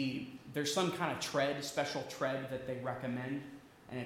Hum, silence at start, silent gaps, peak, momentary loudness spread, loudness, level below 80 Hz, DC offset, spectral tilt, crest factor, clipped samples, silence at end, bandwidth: none; 0 s; none; -20 dBFS; 10 LU; -37 LUFS; -72 dBFS; under 0.1%; -4 dB/octave; 18 dB; under 0.1%; 0 s; 17 kHz